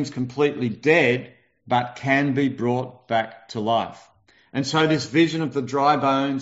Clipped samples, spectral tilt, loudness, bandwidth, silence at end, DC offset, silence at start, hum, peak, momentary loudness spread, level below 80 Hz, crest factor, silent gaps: under 0.1%; -4 dB/octave; -22 LUFS; 8 kHz; 0 s; under 0.1%; 0 s; none; -4 dBFS; 9 LU; -64 dBFS; 18 dB; none